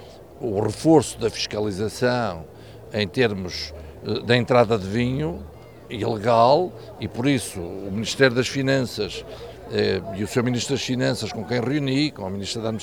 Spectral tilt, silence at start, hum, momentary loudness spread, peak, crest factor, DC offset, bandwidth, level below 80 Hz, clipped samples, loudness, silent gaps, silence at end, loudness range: -5.5 dB/octave; 0 s; none; 14 LU; -2 dBFS; 20 dB; 0.2%; 19.5 kHz; -48 dBFS; under 0.1%; -23 LUFS; none; 0 s; 3 LU